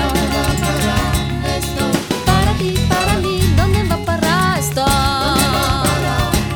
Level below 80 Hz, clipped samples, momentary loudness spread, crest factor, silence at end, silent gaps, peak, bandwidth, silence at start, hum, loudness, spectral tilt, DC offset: -24 dBFS; under 0.1%; 4 LU; 16 dB; 0 s; none; 0 dBFS; over 20 kHz; 0 s; none; -16 LUFS; -4.5 dB/octave; under 0.1%